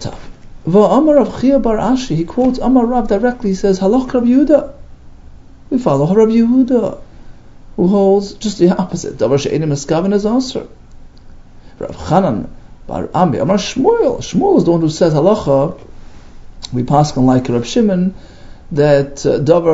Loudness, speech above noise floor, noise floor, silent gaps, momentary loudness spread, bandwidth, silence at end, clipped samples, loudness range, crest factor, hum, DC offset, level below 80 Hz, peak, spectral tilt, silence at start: -13 LUFS; 24 dB; -36 dBFS; none; 12 LU; 8 kHz; 0 s; under 0.1%; 4 LU; 14 dB; none; under 0.1%; -34 dBFS; 0 dBFS; -7 dB/octave; 0 s